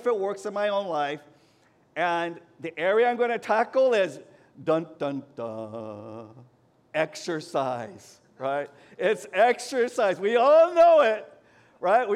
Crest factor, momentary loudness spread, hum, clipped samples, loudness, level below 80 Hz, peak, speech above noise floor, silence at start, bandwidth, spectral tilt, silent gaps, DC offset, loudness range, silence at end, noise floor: 16 dB; 19 LU; none; under 0.1%; -25 LUFS; -76 dBFS; -10 dBFS; 37 dB; 0 s; 12.5 kHz; -4.5 dB/octave; none; under 0.1%; 11 LU; 0 s; -62 dBFS